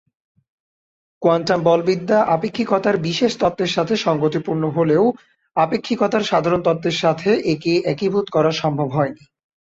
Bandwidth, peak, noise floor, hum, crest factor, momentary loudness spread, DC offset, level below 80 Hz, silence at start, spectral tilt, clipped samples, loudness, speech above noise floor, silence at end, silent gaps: 8 kHz; -4 dBFS; under -90 dBFS; none; 16 dB; 4 LU; under 0.1%; -56 dBFS; 1.2 s; -6 dB/octave; under 0.1%; -19 LUFS; over 72 dB; 0.6 s; none